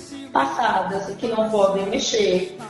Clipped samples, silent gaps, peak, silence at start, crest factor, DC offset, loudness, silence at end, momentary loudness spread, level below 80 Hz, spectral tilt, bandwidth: under 0.1%; none; -4 dBFS; 0 s; 18 dB; under 0.1%; -21 LUFS; 0 s; 6 LU; -54 dBFS; -3.5 dB/octave; 11.5 kHz